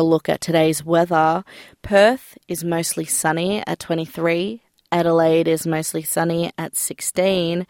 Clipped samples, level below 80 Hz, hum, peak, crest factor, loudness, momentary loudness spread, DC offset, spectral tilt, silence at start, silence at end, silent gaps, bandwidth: under 0.1%; -56 dBFS; none; -4 dBFS; 16 dB; -19 LUFS; 9 LU; under 0.1%; -4.5 dB/octave; 0 s; 0.05 s; none; 17 kHz